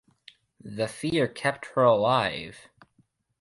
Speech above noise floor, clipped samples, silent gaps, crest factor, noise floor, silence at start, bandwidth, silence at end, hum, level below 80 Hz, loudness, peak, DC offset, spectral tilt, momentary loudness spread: 42 dB; under 0.1%; none; 20 dB; -68 dBFS; 0.65 s; 11.5 kHz; 0.8 s; none; -62 dBFS; -25 LUFS; -8 dBFS; under 0.1%; -5.5 dB/octave; 16 LU